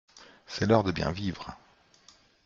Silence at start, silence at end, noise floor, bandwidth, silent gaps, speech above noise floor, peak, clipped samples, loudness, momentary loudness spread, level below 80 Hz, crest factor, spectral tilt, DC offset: 0.15 s; 0.9 s; -60 dBFS; 7.6 kHz; none; 32 dB; -6 dBFS; under 0.1%; -28 LUFS; 17 LU; -54 dBFS; 24 dB; -6.5 dB/octave; under 0.1%